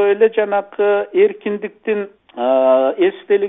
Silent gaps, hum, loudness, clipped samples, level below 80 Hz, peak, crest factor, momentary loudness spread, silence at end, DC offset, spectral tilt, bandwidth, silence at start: none; none; -16 LUFS; under 0.1%; -64 dBFS; -2 dBFS; 14 dB; 10 LU; 0 s; under 0.1%; -10 dB/octave; 3.9 kHz; 0 s